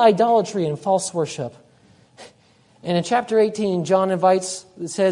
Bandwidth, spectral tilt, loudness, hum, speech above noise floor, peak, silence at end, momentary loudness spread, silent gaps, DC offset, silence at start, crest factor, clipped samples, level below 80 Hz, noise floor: 11 kHz; -5 dB/octave; -20 LUFS; none; 36 dB; -2 dBFS; 0 s; 13 LU; none; under 0.1%; 0 s; 18 dB; under 0.1%; -68 dBFS; -56 dBFS